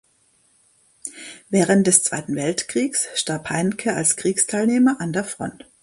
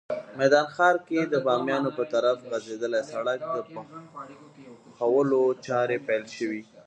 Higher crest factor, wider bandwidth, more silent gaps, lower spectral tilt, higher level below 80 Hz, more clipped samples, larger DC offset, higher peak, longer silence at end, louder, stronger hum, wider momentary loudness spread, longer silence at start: about the same, 22 dB vs 20 dB; first, 11.5 kHz vs 9 kHz; neither; second, -3.5 dB/octave vs -5.5 dB/octave; first, -62 dBFS vs -76 dBFS; neither; neither; first, 0 dBFS vs -8 dBFS; first, 0.3 s vs 0.05 s; first, -20 LUFS vs -26 LUFS; neither; about the same, 17 LU vs 18 LU; first, 1.05 s vs 0.1 s